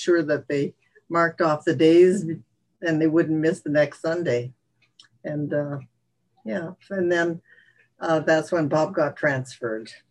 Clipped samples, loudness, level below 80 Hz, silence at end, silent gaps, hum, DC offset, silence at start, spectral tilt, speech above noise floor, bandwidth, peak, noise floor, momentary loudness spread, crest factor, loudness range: under 0.1%; -23 LUFS; -70 dBFS; 0.15 s; none; none; under 0.1%; 0 s; -6.5 dB/octave; 46 dB; 11 kHz; -6 dBFS; -68 dBFS; 13 LU; 18 dB; 8 LU